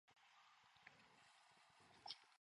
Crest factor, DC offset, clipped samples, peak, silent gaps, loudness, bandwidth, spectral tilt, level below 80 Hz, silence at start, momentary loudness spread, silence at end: 34 dB; under 0.1%; under 0.1%; -32 dBFS; none; -62 LUFS; 11 kHz; -1 dB/octave; under -90 dBFS; 0.05 s; 13 LU; 0.05 s